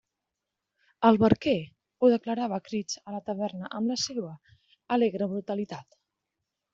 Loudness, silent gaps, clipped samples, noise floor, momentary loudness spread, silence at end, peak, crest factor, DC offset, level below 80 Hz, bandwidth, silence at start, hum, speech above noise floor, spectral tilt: -28 LUFS; none; under 0.1%; -86 dBFS; 13 LU; 0.9 s; -6 dBFS; 24 dB; under 0.1%; -64 dBFS; 7.8 kHz; 1 s; none; 59 dB; -5 dB/octave